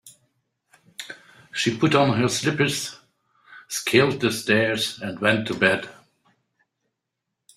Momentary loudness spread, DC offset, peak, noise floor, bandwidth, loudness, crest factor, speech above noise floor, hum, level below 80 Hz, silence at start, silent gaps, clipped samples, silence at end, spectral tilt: 19 LU; under 0.1%; -2 dBFS; -82 dBFS; 16 kHz; -22 LUFS; 22 dB; 60 dB; none; -62 dBFS; 0.05 s; none; under 0.1%; 1.65 s; -4 dB/octave